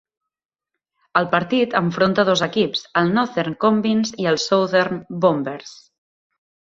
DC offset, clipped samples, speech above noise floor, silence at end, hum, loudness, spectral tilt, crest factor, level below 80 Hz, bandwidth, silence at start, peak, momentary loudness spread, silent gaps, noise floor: under 0.1%; under 0.1%; 67 dB; 1 s; none; -19 LUFS; -5 dB/octave; 20 dB; -60 dBFS; 7.8 kHz; 1.15 s; -2 dBFS; 5 LU; none; -86 dBFS